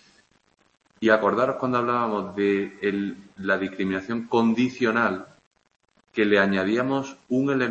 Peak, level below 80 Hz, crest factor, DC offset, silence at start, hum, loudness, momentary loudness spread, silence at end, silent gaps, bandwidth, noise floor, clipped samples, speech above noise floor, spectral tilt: -6 dBFS; -66 dBFS; 18 dB; under 0.1%; 1 s; none; -24 LUFS; 8 LU; 0 s; 5.46-5.51 s; 8 kHz; -65 dBFS; under 0.1%; 41 dB; -6.5 dB/octave